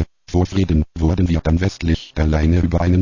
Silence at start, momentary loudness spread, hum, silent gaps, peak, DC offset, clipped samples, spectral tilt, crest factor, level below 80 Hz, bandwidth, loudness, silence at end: 0 s; 4 LU; none; none; -6 dBFS; under 0.1%; under 0.1%; -7.5 dB/octave; 10 dB; -22 dBFS; 7.4 kHz; -18 LUFS; 0 s